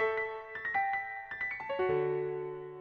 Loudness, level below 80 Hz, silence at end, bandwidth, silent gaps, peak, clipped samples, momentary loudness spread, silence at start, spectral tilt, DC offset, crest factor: -34 LUFS; -68 dBFS; 0 s; 6.2 kHz; none; -18 dBFS; under 0.1%; 8 LU; 0 s; -7.5 dB/octave; under 0.1%; 16 dB